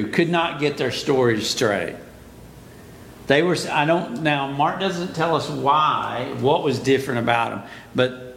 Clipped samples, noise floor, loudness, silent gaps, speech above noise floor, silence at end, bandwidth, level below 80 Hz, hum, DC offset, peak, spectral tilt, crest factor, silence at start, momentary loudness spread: under 0.1%; -42 dBFS; -21 LUFS; none; 22 dB; 0 s; 17 kHz; -54 dBFS; none; under 0.1%; -2 dBFS; -5 dB/octave; 20 dB; 0 s; 7 LU